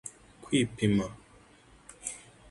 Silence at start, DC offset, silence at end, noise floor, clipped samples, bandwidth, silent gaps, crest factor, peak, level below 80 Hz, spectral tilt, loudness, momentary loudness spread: 0.05 s; under 0.1%; 0.3 s; -58 dBFS; under 0.1%; 11.5 kHz; none; 20 dB; -12 dBFS; -56 dBFS; -5 dB/octave; -31 LUFS; 22 LU